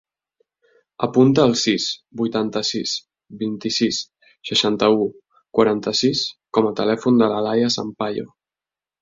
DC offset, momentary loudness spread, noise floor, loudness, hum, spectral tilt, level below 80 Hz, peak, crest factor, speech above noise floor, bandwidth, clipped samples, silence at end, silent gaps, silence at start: under 0.1%; 10 LU; under -90 dBFS; -20 LUFS; none; -4.5 dB/octave; -60 dBFS; -2 dBFS; 18 dB; over 71 dB; 7.8 kHz; under 0.1%; 0.75 s; none; 1 s